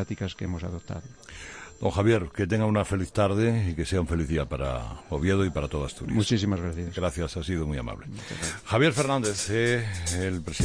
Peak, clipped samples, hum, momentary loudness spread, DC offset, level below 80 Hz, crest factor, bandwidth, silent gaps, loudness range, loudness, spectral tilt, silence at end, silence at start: -10 dBFS; under 0.1%; none; 13 LU; under 0.1%; -42 dBFS; 16 dB; 10.5 kHz; none; 2 LU; -27 LUFS; -5.5 dB/octave; 0 s; 0 s